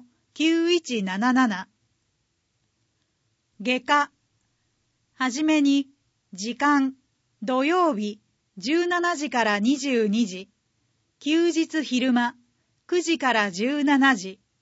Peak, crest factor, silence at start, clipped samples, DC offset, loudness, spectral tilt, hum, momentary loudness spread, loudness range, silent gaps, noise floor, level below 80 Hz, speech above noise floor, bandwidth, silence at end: -6 dBFS; 18 dB; 0.35 s; under 0.1%; under 0.1%; -23 LUFS; -4 dB/octave; none; 11 LU; 4 LU; none; -73 dBFS; -76 dBFS; 51 dB; 8 kHz; 0.25 s